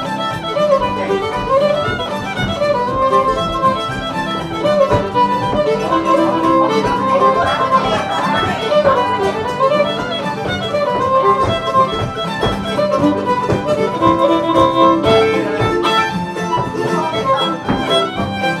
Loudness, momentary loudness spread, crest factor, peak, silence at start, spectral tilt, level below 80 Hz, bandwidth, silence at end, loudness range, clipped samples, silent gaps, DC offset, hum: -15 LUFS; 7 LU; 14 dB; -2 dBFS; 0 s; -5.5 dB/octave; -38 dBFS; 14 kHz; 0 s; 2 LU; under 0.1%; none; under 0.1%; none